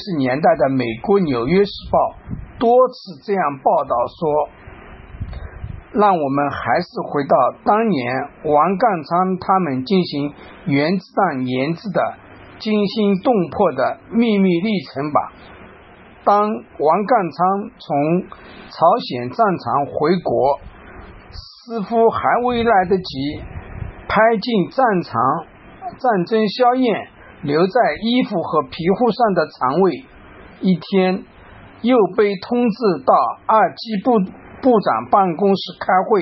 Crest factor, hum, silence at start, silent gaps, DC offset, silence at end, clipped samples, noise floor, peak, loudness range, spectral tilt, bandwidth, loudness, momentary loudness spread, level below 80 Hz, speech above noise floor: 16 dB; none; 0 s; none; under 0.1%; 0 s; under 0.1%; -43 dBFS; -2 dBFS; 2 LU; -9 dB/octave; 6 kHz; -18 LUFS; 12 LU; -46 dBFS; 26 dB